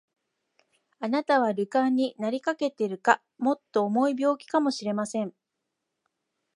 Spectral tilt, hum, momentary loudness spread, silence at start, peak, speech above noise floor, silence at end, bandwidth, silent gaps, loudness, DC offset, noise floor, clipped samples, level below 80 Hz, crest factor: -5 dB/octave; none; 6 LU; 1 s; -4 dBFS; 57 dB; 1.25 s; 11.5 kHz; none; -27 LUFS; under 0.1%; -83 dBFS; under 0.1%; -82 dBFS; 24 dB